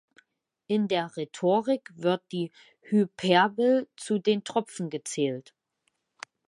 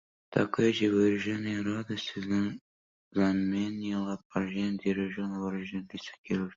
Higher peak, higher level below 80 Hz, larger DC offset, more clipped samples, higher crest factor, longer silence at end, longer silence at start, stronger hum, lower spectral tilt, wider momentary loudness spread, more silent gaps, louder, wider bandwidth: first, -6 dBFS vs -10 dBFS; second, -78 dBFS vs -62 dBFS; neither; neither; about the same, 22 dB vs 20 dB; first, 1.05 s vs 0.05 s; first, 0.7 s vs 0.3 s; neither; second, -5 dB/octave vs -6.5 dB/octave; about the same, 12 LU vs 10 LU; second, none vs 2.61-3.11 s, 4.25-4.30 s, 6.18-6.24 s; first, -27 LUFS vs -31 LUFS; first, 11.5 kHz vs 7.6 kHz